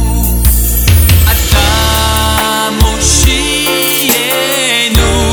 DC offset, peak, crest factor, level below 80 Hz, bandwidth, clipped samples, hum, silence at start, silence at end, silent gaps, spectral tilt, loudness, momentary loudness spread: under 0.1%; 0 dBFS; 10 dB; -14 dBFS; over 20 kHz; 0.2%; none; 0 s; 0 s; none; -3 dB/octave; -9 LUFS; 3 LU